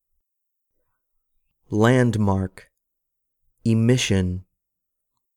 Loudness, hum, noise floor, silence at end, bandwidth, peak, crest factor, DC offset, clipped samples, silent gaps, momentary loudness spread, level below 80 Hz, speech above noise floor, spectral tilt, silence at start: -21 LUFS; none; -80 dBFS; 0.95 s; 13.5 kHz; -2 dBFS; 22 dB; under 0.1%; under 0.1%; none; 11 LU; -52 dBFS; 61 dB; -6 dB/octave; 1.7 s